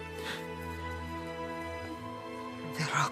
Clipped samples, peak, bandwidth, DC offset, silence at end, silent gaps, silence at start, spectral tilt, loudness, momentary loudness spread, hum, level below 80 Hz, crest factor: under 0.1%; -16 dBFS; 15.5 kHz; under 0.1%; 0 s; none; 0 s; -4.5 dB/octave; -38 LUFS; 8 LU; none; -58 dBFS; 22 dB